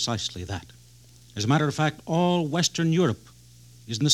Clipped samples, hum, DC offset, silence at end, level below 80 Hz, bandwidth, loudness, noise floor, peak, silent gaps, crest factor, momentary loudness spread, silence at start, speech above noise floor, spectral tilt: under 0.1%; 60 Hz at -45 dBFS; under 0.1%; 0 s; -58 dBFS; 14 kHz; -25 LUFS; -52 dBFS; -8 dBFS; none; 18 dB; 13 LU; 0 s; 28 dB; -4.5 dB/octave